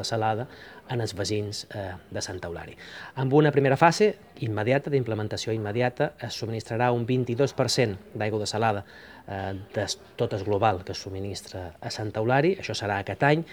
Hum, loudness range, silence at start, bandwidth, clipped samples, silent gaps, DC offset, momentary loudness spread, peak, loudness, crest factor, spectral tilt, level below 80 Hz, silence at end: none; 5 LU; 0 s; 20 kHz; under 0.1%; none; under 0.1%; 14 LU; -2 dBFS; -27 LUFS; 24 dB; -5.5 dB/octave; -60 dBFS; 0 s